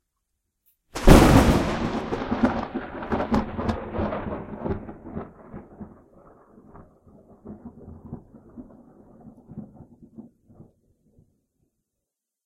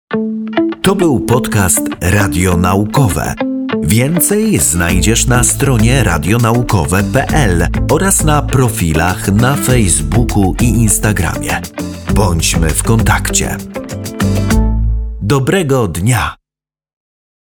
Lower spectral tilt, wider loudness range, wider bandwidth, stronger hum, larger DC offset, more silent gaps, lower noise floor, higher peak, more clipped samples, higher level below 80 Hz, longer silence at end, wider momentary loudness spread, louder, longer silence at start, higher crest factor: first, -6.5 dB/octave vs -5 dB/octave; first, 25 LU vs 3 LU; second, 16.5 kHz vs 20 kHz; neither; neither; neither; second, -84 dBFS vs -89 dBFS; about the same, -2 dBFS vs 0 dBFS; neither; second, -32 dBFS vs -22 dBFS; first, 2.25 s vs 1.05 s; first, 28 LU vs 7 LU; second, -22 LUFS vs -12 LUFS; first, 0.95 s vs 0.1 s; first, 24 dB vs 12 dB